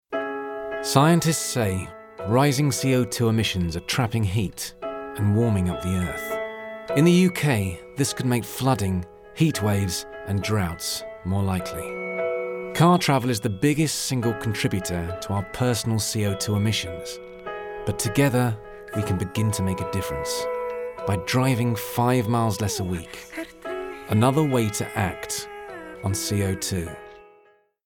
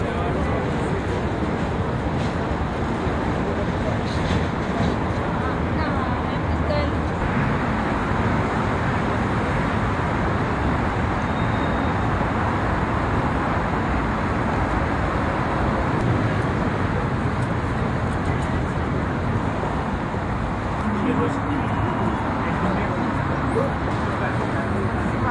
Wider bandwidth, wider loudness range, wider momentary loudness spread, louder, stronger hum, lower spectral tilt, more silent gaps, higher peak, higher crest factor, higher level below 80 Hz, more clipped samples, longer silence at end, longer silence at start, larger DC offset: first, 18 kHz vs 11 kHz; about the same, 3 LU vs 2 LU; first, 12 LU vs 2 LU; about the same, -24 LUFS vs -23 LUFS; neither; second, -5 dB/octave vs -7.5 dB/octave; neither; first, -4 dBFS vs -8 dBFS; first, 20 dB vs 14 dB; second, -48 dBFS vs -32 dBFS; neither; first, 0.65 s vs 0 s; about the same, 0.1 s vs 0 s; neither